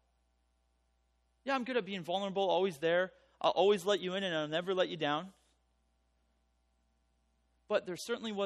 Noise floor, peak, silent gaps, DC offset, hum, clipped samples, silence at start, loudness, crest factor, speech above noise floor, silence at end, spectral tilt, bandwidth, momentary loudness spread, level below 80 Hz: -76 dBFS; -16 dBFS; none; under 0.1%; 60 Hz at -65 dBFS; under 0.1%; 1.45 s; -34 LUFS; 20 dB; 42 dB; 0 s; -4.5 dB/octave; 12.5 kHz; 9 LU; -76 dBFS